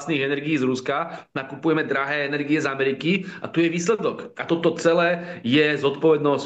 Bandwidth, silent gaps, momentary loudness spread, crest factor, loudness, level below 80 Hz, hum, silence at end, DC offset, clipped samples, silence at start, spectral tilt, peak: 8.6 kHz; none; 8 LU; 16 dB; -22 LUFS; -70 dBFS; none; 0 s; under 0.1%; under 0.1%; 0 s; -5.5 dB/octave; -6 dBFS